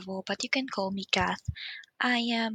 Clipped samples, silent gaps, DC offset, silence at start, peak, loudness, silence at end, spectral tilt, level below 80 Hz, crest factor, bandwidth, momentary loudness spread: under 0.1%; none; under 0.1%; 0 s; -6 dBFS; -30 LUFS; 0 s; -4 dB/octave; -54 dBFS; 24 dB; 9.6 kHz; 10 LU